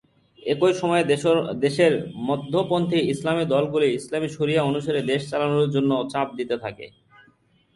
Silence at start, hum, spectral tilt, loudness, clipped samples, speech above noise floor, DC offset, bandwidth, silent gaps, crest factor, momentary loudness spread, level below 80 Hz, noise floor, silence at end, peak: 0.45 s; none; -6 dB/octave; -23 LUFS; under 0.1%; 38 dB; under 0.1%; 11.5 kHz; none; 16 dB; 8 LU; -60 dBFS; -61 dBFS; 0.85 s; -6 dBFS